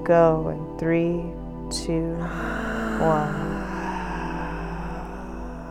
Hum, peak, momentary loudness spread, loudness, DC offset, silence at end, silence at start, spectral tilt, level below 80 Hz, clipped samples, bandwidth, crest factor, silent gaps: none; -6 dBFS; 13 LU; -26 LUFS; under 0.1%; 0 s; 0 s; -6.5 dB/octave; -38 dBFS; under 0.1%; 13.5 kHz; 20 dB; none